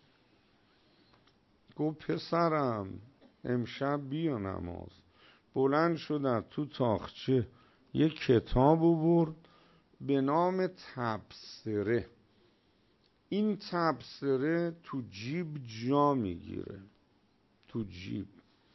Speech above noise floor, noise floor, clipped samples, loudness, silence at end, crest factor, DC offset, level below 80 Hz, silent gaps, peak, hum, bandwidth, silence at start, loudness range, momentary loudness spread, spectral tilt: 38 dB; -70 dBFS; under 0.1%; -32 LUFS; 0.5 s; 20 dB; under 0.1%; -54 dBFS; none; -12 dBFS; none; 6.2 kHz; 1.75 s; 6 LU; 16 LU; -8 dB/octave